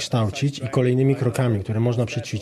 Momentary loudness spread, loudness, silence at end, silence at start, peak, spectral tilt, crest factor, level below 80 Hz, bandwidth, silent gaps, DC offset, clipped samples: 5 LU; -22 LUFS; 0 s; 0 s; -8 dBFS; -6.5 dB/octave; 14 dB; -56 dBFS; 13.5 kHz; none; under 0.1%; under 0.1%